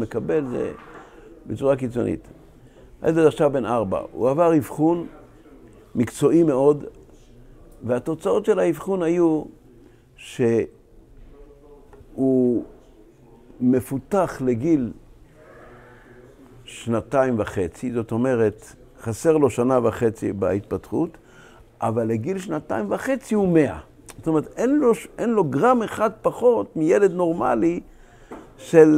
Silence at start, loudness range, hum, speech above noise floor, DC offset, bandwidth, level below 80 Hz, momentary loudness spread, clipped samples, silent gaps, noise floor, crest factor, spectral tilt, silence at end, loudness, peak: 0 s; 5 LU; none; 29 dB; under 0.1%; 15.5 kHz; -50 dBFS; 13 LU; under 0.1%; none; -50 dBFS; 22 dB; -7.5 dB/octave; 0 s; -22 LUFS; 0 dBFS